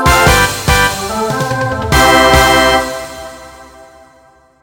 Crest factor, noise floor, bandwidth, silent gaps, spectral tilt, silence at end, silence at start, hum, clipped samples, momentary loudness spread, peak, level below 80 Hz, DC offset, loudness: 12 dB; -46 dBFS; over 20 kHz; none; -3.5 dB/octave; 0.95 s; 0 s; none; 0.2%; 16 LU; 0 dBFS; -24 dBFS; under 0.1%; -10 LUFS